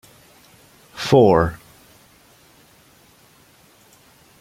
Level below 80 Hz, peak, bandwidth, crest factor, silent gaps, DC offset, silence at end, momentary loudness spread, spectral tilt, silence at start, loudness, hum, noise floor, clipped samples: -48 dBFS; -2 dBFS; 16.5 kHz; 22 dB; none; under 0.1%; 2.85 s; 28 LU; -6.5 dB/octave; 0.95 s; -16 LUFS; none; -53 dBFS; under 0.1%